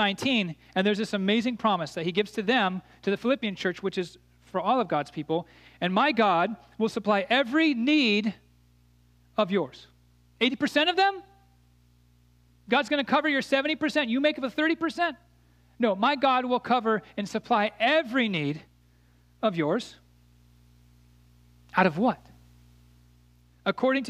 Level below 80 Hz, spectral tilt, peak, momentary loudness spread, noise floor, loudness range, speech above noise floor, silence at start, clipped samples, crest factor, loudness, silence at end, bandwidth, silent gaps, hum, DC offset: -64 dBFS; -5.5 dB/octave; -6 dBFS; 9 LU; -61 dBFS; 6 LU; 35 dB; 0 s; under 0.1%; 22 dB; -26 LUFS; 0 s; 14 kHz; none; 60 Hz at -55 dBFS; under 0.1%